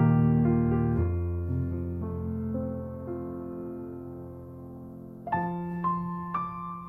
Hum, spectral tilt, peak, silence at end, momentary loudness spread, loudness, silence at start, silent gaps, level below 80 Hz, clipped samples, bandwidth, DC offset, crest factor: none; -12 dB/octave; -14 dBFS; 0 s; 19 LU; -30 LUFS; 0 s; none; -44 dBFS; under 0.1%; 3.8 kHz; under 0.1%; 16 dB